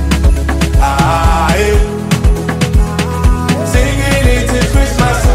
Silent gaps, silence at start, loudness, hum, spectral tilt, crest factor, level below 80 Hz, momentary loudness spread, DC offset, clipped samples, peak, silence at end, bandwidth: none; 0 s; -12 LUFS; none; -5.5 dB/octave; 10 dB; -14 dBFS; 3 LU; under 0.1%; under 0.1%; 0 dBFS; 0 s; 16 kHz